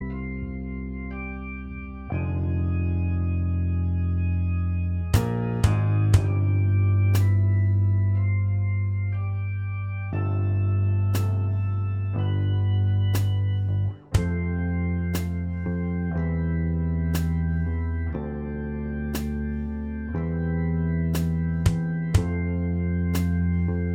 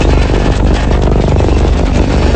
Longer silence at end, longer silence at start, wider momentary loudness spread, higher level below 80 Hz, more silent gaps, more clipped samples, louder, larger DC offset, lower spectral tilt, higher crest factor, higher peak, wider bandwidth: about the same, 0 s vs 0 s; about the same, 0 s vs 0 s; first, 9 LU vs 1 LU; second, -36 dBFS vs -12 dBFS; neither; neither; second, -25 LUFS vs -11 LUFS; neither; about the same, -7.5 dB/octave vs -7 dB/octave; first, 18 dB vs 8 dB; second, -6 dBFS vs 0 dBFS; first, 16 kHz vs 8.8 kHz